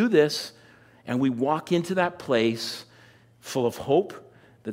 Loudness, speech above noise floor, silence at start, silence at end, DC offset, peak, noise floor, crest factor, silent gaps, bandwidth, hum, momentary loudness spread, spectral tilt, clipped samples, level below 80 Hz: -25 LUFS; 30 dB; 0 s; 0 s; under 0.1%; -8 dBFS; -54 dBFS; 18 dB; none; 16 kHz; none; 16 LU; -5.5 dB/octave; under 0.1%; -66 dBFS